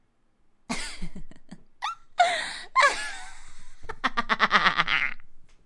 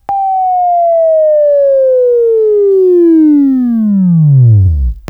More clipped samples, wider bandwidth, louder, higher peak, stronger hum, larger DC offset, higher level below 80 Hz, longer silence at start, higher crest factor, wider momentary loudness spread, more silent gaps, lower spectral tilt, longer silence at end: neither; first, 11.5 kHz vs 3 kHz; second, -25 LUFS vs -8 LUFS; about the same, 0 dBFS vs 0 dBFS; neither; neither; second, -44 dBFS vs -24 dBFS; first, 0.7 s vs 0.1 s; first, 28 dB vs 8 dB; first, 21 LU vs 5 LU; neither; second, -2 dB/octave vs -13 dB/octave; about the same, 0.2 s vs 0.1 s